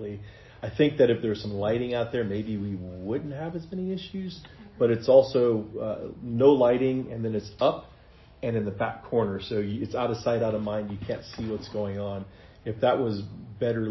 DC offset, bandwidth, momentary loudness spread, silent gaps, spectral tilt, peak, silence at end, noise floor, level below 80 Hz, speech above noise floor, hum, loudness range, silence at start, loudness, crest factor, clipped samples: under 0.1%; 6 kHz; 15 LU; none; -8 dB/octave; -6 dBFS; 0 s; -52 dBFS; -54 dBFS; 26 dB; none; 7 LU; 0 s; -27 LUFS; 20 dB; under 0.1%